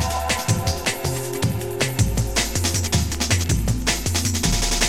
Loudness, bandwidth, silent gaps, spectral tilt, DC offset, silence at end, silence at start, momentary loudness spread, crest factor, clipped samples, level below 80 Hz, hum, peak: -21 LUFS; 17 kHz; none; -3.5 dB/octave; 0.8%; 0 s; 0 s; 4 LU; 16 dB; under 0.1%; -28 dBFS; none; -6 dBFS